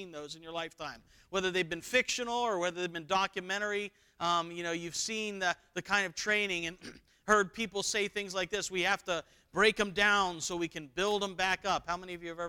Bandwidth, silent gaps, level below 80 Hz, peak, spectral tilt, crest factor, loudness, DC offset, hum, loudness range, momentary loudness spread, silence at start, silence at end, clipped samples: 19 kHz; none; -62 dBFS; -10 dBFS; -2.5 dB/octave; 22 dB; -32 LUFS; under 0.1%; none; 3 LU; 12 LU; 0 s; 0 s; under 0.1%